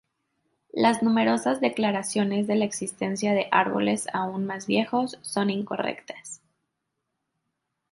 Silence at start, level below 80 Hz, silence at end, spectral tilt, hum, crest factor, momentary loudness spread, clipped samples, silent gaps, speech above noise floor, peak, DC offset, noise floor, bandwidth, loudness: 0.75 s; -70 dBFS; 1.55 s; -4.5 dB/octave; none; 22 dB; 10 LU; under 0.1%; none; 56 dB; -4 dBFS; under 0.1%; -81 dBFS; 11.5 kHz; -25 LUFS